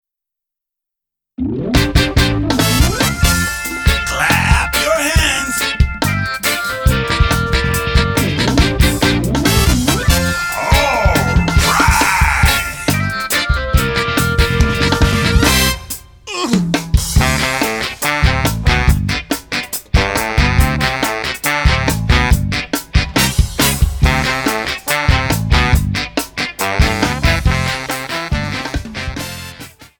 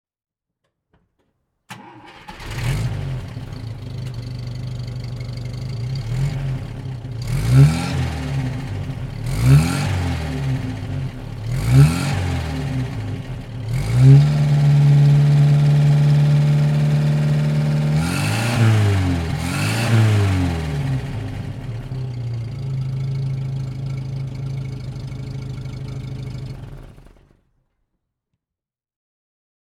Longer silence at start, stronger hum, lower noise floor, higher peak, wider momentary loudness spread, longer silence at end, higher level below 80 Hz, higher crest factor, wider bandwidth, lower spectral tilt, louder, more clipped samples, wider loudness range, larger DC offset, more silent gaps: second, 1.4 s vs 1.7 s; neither; second, -83 dBFS vs -88 dBFS; about the same, 0 dBFS vs 0 dBFS; second, 7 LU vs 16 LU; second, 0.15 s vs 2.75 s; first, -20 dBFS vs -36 dBFS; about the same, 14 dB vs 18 dB; first, over 20 kHz vs 13 kHz; second, -4 dB/octave vs -7 dB/octave; first, -15 LUFS vs -19 LUFS; neither; second, 3 LU vs 15 LU; neither; neither